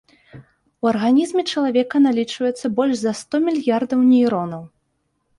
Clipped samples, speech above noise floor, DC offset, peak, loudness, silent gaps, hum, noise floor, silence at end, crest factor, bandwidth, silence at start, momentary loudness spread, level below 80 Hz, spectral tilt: under 0.1%; 52 dB; under 0.1%; -6 dBFS; -19 LUFS; none; none; -70 dBFS; 0.7 s; 14 dB; 11.5 kHz; 0.35 s; 8 LU; -62 dBFS; -5.5 dB/octave